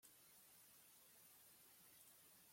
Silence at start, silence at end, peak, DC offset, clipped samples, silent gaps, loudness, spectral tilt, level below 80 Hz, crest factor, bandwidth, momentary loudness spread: 0 s; 0 s; -52 dBFS; under 0.1%; under 0.1%; none; -66 LUFS; -1 dB/octave; under -90 dBFS; 18 dB; 16.5 kHz; 1 LU